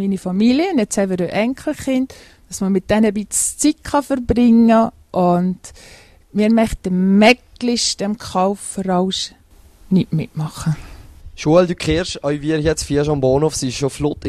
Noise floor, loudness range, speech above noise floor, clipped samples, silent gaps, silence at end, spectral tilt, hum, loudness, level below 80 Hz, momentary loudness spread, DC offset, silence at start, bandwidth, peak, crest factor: -46 dBFS; 4 LU; 29 dB; under 0.1%; none; 0 s; -5 dB/octave; none; -17 LUFS; -38 dBFS; 10 LU; under 0.1%; 0 s; 13.5 kHz; 0 dBFS; 18 dB